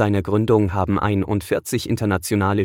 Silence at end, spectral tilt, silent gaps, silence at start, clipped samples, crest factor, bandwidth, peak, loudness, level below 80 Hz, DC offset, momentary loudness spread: 0 s; -6.5 dB/octave; none; 0 s; under 0.1%; 14 dB; 16.5 kHz; -6 dBFS; -20 LUFS; -46 dBFS; under 0.1%; 5 LU